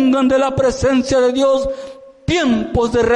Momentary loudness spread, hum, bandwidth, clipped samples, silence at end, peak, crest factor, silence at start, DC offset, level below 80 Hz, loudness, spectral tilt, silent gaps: 11 LU; none; 11 kHz; under 0.1%; 0 s; -6 dBFS; 8 dB; 0 s; under 0.1%; -36 dBFS; -16 LUFS; -5.5 dB/octave; none